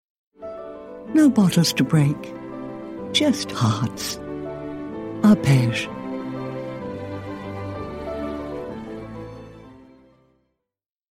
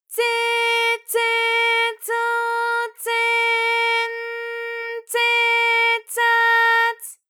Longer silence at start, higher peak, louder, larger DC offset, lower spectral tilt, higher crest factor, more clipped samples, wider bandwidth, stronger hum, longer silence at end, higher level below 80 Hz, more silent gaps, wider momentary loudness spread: first, 0.4 s vs 0.1 s; first, -4 dBFS vs -8 dBFS; second, -22 LUFS vs -18 LUFS; neither; first, -5.5 dB/octave vs 5 dB/octave; first, 20 dB vs 12 dB; neither; second, 16 kHz vs 20 kHz; neither; first, 1.25 s vs 0.15 s; first, -52 dBFS vs under -90 dBFS; neither; first, 19 LU vs 10 LU